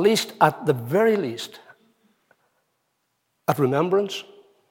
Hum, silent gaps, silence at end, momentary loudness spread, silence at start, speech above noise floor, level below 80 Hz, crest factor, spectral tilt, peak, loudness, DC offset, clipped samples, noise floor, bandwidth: none; none; 0.5 s; 12 LU; 0 s; 52 dB; -74 dBFS; 22 dB; -5 dB/octave; -2 dBFS; -22 LUFS; under 0.1%; under 0.1%; -74 dBFS; 17 kHz